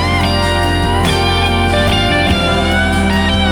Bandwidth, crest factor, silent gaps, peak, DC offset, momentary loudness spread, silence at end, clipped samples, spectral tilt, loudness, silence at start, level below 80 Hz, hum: 17 kHz; 12 dB; none; 0 dBFS; under 0.1%; 1 LU; 0 s; under 0.1%; -5 dB/octave; -13 LUFS; 0 s; -22 dBFS; none